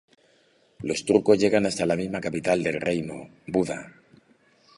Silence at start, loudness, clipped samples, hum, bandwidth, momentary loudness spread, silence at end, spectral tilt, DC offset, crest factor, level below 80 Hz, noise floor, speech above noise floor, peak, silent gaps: 0.8 s; -24 LUFS; under 0.1%; none; 11.5 kHz; 15 LU; 0.9 s; -5.5 dB/octave; under 0.1%; 22 dB; -58 dBFS; -62 dBFS; 38 dB; -4 dBFS; none